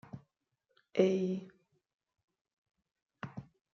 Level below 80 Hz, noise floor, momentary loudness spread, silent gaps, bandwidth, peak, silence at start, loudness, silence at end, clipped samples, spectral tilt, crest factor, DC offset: -78 dBFS; -83 dBFS; 22 LU; 1.94-1.99 s, 2.24-2.28 s, 2.41-2.45 s, 2.53-2.63 s, 3.02-3.06 s; 7 kHz; -14 dBFS; 0.15 s; -33 LUFS; 0.3 s; under 0.1%; -7 dB/octave; 26 dB; under 0.1%